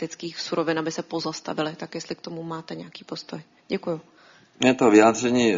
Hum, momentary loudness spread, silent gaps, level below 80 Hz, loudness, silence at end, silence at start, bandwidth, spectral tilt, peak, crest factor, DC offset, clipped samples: none; 20 LU; none; -64 dBFS; -24 LUFS; 0 s; 0 s; 7.6 kHz; -4 dB/octave; -2 dBFS; 22 dB; under 0.1%; under 0.1%